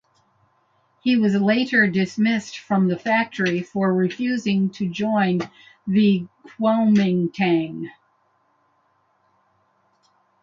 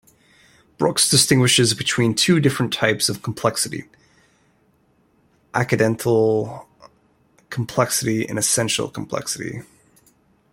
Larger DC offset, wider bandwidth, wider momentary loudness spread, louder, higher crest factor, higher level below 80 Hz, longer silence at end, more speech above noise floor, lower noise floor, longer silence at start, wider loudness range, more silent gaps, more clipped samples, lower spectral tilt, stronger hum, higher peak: neither; second, 7.4 kHz vs 16.5 kHz; second, 9 LU vs 14 LU; about the same, -21 LUFS vs -19 LUFS; second, 16 dB vs 22 dB; second, -66 dBFS vs -56 dBFS; first, 2.55 s vs 0.9 s; first, 45 dB vs 41 dB; first, -65 dBFS vs -61 dBFS; first, 1.05 s vs 0.8 s; second, 3 LU vs 6 LU; neither; neither; first, -7 dB/octave vs -3.5 dB/octave; neither; second, -6 dBFS vs 0 dBFS